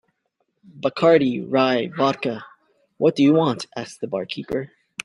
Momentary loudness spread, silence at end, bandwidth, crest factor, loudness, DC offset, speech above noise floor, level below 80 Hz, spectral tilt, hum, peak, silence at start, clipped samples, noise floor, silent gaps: 13 LU; 0.4 s; 11.5 kHz; 18 dB; -21 LUFS; under 0.1%; 52 dB; -62 dBFS; -6 dB/octave; none; -2 dBFS; 0.75 s; under 0.1%; -73 dBFS; none